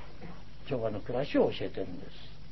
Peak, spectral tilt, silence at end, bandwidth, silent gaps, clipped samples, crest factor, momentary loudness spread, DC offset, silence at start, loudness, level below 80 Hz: -14 dBFS; -5.5 dB/octave; 0 s; 6 kHz; none; under 0.1%; 20 dB; 20 LU; 1%; 0 s; -33 LUFS; -54 dBFS